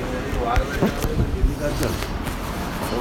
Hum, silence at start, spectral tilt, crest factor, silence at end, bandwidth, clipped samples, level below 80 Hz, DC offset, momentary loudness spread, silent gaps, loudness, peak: none; 0 s; -5.5 dB/octave; 16 dB; 0 s; 17 kHz; under 0.1%; -26 dBFS; under 0.1%; 5 LU; none; -24 LUFS; -6 dBFS